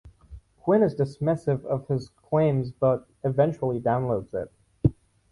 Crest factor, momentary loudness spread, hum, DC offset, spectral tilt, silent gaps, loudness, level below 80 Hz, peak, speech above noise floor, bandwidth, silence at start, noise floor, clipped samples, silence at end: 18 dB; 8 LU; none; under 0.1%; -9.5 dB/octave; none; -26 LUFS; -48 dBFS; -6 dBFS; 23 dB; 11 kHz; 0.05 s; -48 dBFS; under 0.1%; 0.4 s